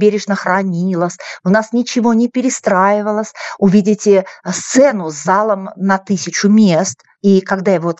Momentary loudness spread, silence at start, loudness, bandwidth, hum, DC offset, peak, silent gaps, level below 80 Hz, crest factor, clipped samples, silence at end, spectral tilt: 8 LU; 0 s; -14 LUFS; 8.2 kHz; none; under 0.1%; 0 dBFS; none; -64 dBFS; 14 dB; under 0.1%; 0.05 s; -5.5 dB/octave